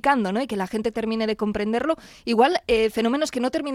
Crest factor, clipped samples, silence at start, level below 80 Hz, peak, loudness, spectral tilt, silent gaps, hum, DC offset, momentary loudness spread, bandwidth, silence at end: 18 dB; under 0.1%; 0.05 s; -50 dBFS; -6 dBFS; -23 LUFS; -5 dB/octave; none; none; under 0.1%; 7 LU; 15 kHz; 0 s